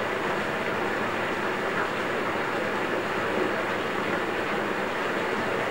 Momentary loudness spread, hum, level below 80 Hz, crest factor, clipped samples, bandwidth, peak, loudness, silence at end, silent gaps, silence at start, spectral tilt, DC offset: 1 LU; none; -60 dBFS; 14 dB; under 0.1%; 16 kHz; -14 dBFS; -27 LUFS; 0 s; none; 0 s; -4.5 dB/octave; 0.4%